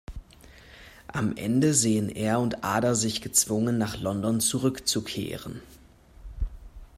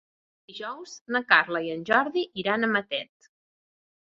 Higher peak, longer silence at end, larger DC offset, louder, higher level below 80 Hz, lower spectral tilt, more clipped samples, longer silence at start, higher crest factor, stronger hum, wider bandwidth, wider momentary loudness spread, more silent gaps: second, -8 dBFS vs -2 dBFS; second, 0.1 s vs 1.15 s; neither; about the same, -26 LUFS vs -25 LUFS; first, -44 dBFS vs -74 dBFS; about the same, -4 dB/octave vs -4 dB/octave; neither; second, 0.1 s vs 0.5 s; second, 20 dB vs 26 dB; neither; first, 16 kHz vs 7.6 kHz; about the same, 16 LU vs 18 LU; second, none vs 1.01-1.06 s